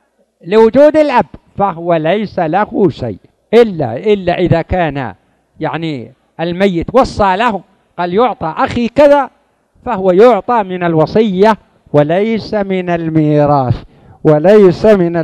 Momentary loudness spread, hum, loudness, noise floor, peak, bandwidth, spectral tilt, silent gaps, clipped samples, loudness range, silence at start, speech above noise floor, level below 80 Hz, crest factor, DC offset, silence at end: 13 LU; none; -11 LUFS; -51 dBFS; 0 dBFS; 9.6 kHz; -8 dB/octave; none; 1%; 4 LU; 0.45 s; 41 dB; -38 dBFS; 12 dB; under 0.1%; 0 s